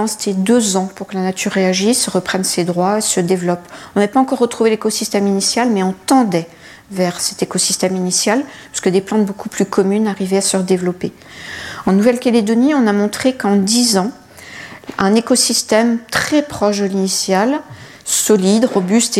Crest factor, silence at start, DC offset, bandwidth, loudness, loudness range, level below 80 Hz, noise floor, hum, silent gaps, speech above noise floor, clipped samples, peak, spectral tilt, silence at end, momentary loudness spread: 14 dB; 0 s; under 0.1%; 16 kHz; -15 LUFS; 2 LU; -54 dBFS; -34 dBFS; none; none; 19 dB; under 0.1%; 0 dBFS; -4 dB/octave; 0 s; 11 LU